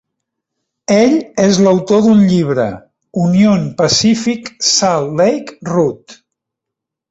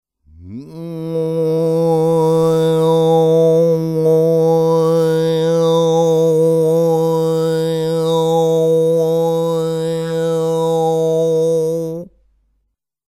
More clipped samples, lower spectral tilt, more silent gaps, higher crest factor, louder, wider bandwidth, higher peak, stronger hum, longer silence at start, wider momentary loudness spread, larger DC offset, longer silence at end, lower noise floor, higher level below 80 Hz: neither; second, -5 dB/octave vs -7 dB/octave; neither; about the same, 12 dB vs 12 dB; first, -12 LUFS vs -15 LUFS; second, 8 kHz vs 14.5 kHz; first, 0 dBFS vs -4 dBFS; neither; first, 0.9 s vs 0.4 s; first, 10 LU vs 7 LU; neither; about the same, 0.95 s vs 1.05 s; first, -81 dBFS vs -69 dBFS; about the same, -50 dBFS vs -52 dBFS